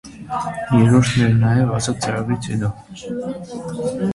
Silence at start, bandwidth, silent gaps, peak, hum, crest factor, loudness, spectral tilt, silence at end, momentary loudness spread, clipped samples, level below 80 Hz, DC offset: 0.05 s; 11.5 kHz; none; -2 dBFS; none; 18 dB; -19 LUFS; -6.5 dB/octave; 0 s; 15 LU; under 0.1%; -44 dBFS; under 0.1%